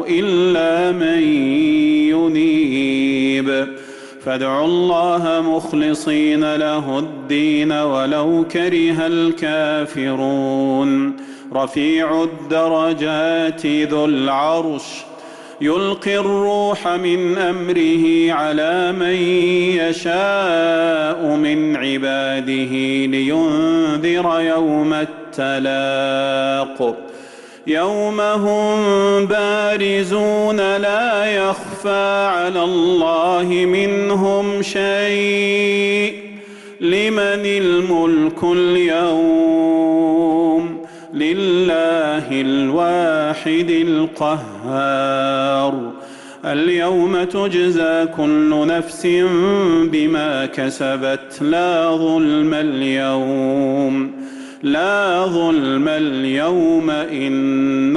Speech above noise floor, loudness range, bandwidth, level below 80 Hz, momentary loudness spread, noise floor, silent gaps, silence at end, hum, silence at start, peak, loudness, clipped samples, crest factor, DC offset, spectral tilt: 22 dB; 3 LU; 11.5 kHz; -56 dBFS; 6 LU; -38 dBFS; none; 0 s; none; 0 s; -8 dBFS; -17 LUFS; under 0.1%; 10 dB; under 0.1%; -5.5 dB/octave